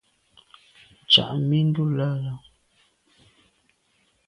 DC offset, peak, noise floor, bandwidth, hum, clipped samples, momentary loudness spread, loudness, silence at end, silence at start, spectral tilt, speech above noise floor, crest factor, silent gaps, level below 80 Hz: under 0.1%; -2 dBFS; -67 dBFS; 10.5 kHz; none; under 0.1%; 15 LU; -21 LUFS; 1.9 s; 1.1 s; -6.5 dB/octave; 44 dB; 24 dB; none; -62 dBFS